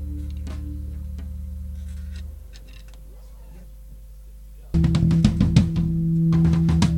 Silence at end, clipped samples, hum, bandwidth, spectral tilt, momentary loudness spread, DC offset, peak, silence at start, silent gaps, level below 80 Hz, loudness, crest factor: 0 s; under 0.1%; 50 Hz at -45 dBFS; 10.5 kHz; -7.5 dB/octave; 21 LU; under 0.1%; -2 dBFS; 0 s; none; -32 dBFS; -22 LUFS; 20 dB